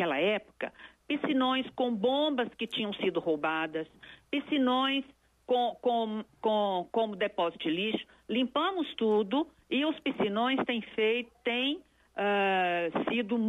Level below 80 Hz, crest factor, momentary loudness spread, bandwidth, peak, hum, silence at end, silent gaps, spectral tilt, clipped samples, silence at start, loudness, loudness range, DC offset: -70 dBFS; 14 dB; 8 LU; 11 kHz; -18 dBFS; none; 0 s; none; -6 dB/octave; under 0.1%; 0 s; -30 LUFS; 1 LU; under 0.1%